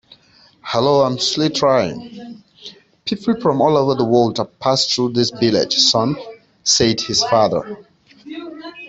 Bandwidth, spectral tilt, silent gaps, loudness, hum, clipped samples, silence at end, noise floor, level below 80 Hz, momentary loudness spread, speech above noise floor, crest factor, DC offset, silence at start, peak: 8.2 kHz; -4 dB/octave; none; -16 LUFS; none; under 0.1%; 0 s; -51 dBFS; -54 dBFS; 21 LU; 35 dB; 18 dB; under 0.1%; 0.65 s; -2 dBFS